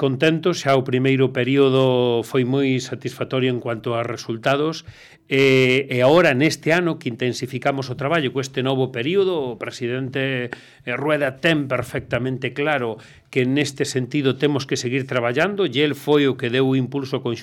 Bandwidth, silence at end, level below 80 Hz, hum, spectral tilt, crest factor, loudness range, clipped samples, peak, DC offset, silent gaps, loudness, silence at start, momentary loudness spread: 16 kHz; 0 s; -60 dBFS; none; -5.5 dB/octave; 14 dB; 4 LU; under 0.1%; -6 dBFS; under 0.1%; none; -20 LUFS; 0 s; 9 LU